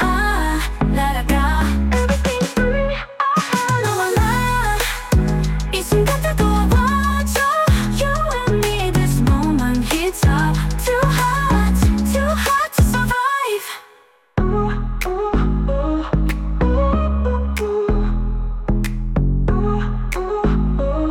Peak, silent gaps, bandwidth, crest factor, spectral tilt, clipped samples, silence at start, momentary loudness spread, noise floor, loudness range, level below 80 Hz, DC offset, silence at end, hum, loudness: -6 dBFS; none; 17 kHz; 12 dB; -5.5 dB/octave; under 0.1%; 0 s; 6 LU; -51 dBFS; 4 LU; -22 dBFS; under 0.1%; 0 s; none; -18 LUFS